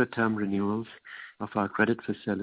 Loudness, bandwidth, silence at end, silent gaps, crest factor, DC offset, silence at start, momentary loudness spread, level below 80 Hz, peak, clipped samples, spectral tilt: -29 LUFS; 4 kHz; 0 s; none; 20 dB; under 0.1%; 0 s; 16 LU; -62 dBFS; -10 dBFS; under 0.1%; -5.5 dB/octave